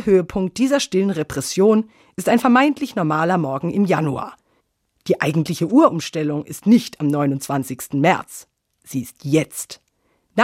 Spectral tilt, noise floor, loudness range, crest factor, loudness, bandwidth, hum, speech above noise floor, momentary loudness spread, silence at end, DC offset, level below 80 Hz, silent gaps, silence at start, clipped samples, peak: -5.5 dB/octave; -67 dBFS; 3 LU; 18 dB; -19 LUFS; 16 kHz; none; 48 dB; 14 LU; 0 s; under 0.1%; -54 dBFS; none; 0 s; under 0.1%; -2 dBFS